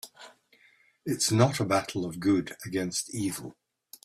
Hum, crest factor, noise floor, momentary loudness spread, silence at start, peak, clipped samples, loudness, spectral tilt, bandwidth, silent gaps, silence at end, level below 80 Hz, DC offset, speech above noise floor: none; 20 dB; -63 dBFS; 16 LU; 0.05 s; -10 dBFS; under 0.1%; -28 LUFS; -4.5 dB/octave; 15.5 kHz; none; 0.55 s; -64 dBFS; under 0.1%; 35 dB